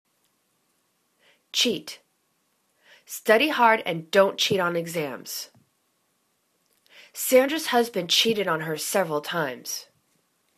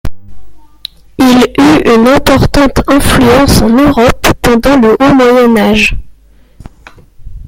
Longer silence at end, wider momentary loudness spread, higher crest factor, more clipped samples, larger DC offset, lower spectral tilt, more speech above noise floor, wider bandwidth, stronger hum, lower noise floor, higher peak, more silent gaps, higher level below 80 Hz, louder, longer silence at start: first, 0.75 s vs 0.05 s; about the same, 14 LU vs 12 LU; first, 22 dB vs 8 dB; second, under 0.1% vs 0.2%; neither; second, -2.5 dB/octave vs -5.5 dB/octave; first, 47 dB vs 33 dB; second, 14 kHz vs 17 kHz; neither; first, -71 dBFS vs -39 dBFS; second, -4 dBFS vs 0 dBFS; neither; second, -74 dBFS vs -22 dBFS; second, -23 LUFS vs -6 LUFS; first, 1.55 s vs 0.05 s